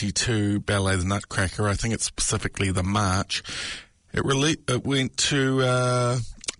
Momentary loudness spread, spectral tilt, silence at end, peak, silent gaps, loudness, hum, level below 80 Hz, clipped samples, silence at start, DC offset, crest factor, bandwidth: 7 LU; -4 dB/octave; 0.05 s; -10 dBFS; none; -24 LUFS; none; -44 dBFS; under 0.1%; 0 s; under 0.1%; 14 dB; 11 kHz